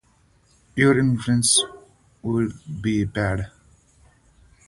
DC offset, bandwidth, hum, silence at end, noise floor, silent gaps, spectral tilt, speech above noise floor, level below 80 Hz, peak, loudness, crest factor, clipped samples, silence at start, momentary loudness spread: under 0.1%; 11.5 kHz; none; 1.2 s; -60 dBFS; none; -4 dB/octave; 39 dB; -46 dBFS; -4 dBFS; -21 LUFS; 20 dB; under 0.1%; 0.75 s; 14 LU